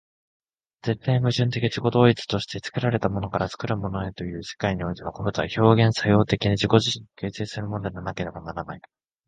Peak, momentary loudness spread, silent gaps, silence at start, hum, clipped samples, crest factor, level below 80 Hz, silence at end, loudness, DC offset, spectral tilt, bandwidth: 0 dBFS; 13 LU; none; 0.85 s; none; under 0.1%; 24 dB; -48 dBFS; 0.5 s; -24 LUFS; under 0.1%; -6.5 dB/octave; 9.2 kHz